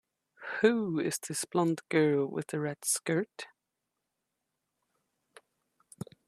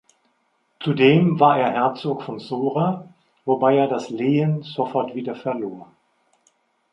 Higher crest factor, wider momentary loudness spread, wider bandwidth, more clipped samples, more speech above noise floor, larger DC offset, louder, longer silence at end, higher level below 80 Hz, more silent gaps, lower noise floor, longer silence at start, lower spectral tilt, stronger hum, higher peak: about the same, 22 dB vs 20 dB; first, 19 LU vs 14 LU; first, 15 kHz vs 8 kHz; neither; first, 56 dB vs 48 dB; neither; second, -31 LUFS vs -21 LUFS; first, 2.8 s vs 1.1 s; second, -78 dBFS vs -66 dBFS; neither; first, -86 dBFS vs -67 dBFS; second, 0.4 s vs 0.8 s; second, -4.5 dB/octave vs -8 dB/octave; neither; second, -12 dBFS vs -2 dBFS